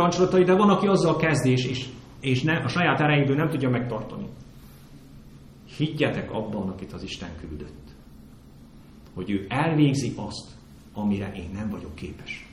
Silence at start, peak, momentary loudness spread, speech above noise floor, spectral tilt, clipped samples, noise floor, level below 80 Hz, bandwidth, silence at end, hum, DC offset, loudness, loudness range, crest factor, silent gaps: 0 s; -8 dBFS; 18 LU; 24 dB; -6.5 dB/octave; under 0.1%; -48 dBFS; -50 dBFS; 13.5 kHz; 0 s; none; under 0.1%; -24 LUFS; 10 LU; 18 dB; none